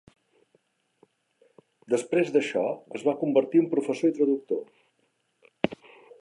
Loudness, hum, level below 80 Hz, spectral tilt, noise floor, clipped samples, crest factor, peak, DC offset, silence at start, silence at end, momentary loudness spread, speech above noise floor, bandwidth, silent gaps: -26 LUFS; none; -72 dBFS; -6 dB/octave; -72 dBFS; under 0.1%; 24 dB; -4 dBFS; under 0.1%; 1.9 s; 0.45 s; 8 LU; 47 dB; 11.5 kHz; none